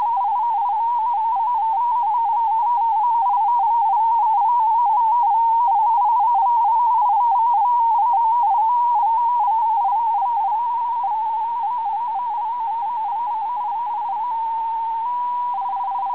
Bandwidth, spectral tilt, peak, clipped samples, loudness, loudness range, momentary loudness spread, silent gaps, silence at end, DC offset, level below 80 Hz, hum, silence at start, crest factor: 4 kHz; -5 dB/octave; -12 dBFS; under 0.1%; -19 LUFS; 6 LU; 7 LU; none; 0 s; 0.4%; -70 dBFS; none; 0 s; 6 dB